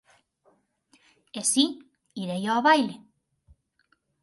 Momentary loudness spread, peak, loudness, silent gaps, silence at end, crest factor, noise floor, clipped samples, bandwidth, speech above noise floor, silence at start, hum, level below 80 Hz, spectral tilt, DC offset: 22 LU; -8 dBFS; -24 LUFS; none; 1.25 s; 22 dB; -70 dBFS; under 0.1%; 12 kHz; 46 dB; 1.35 s; none; -72 dBFS; -2.5 dB/octave; under 0.1%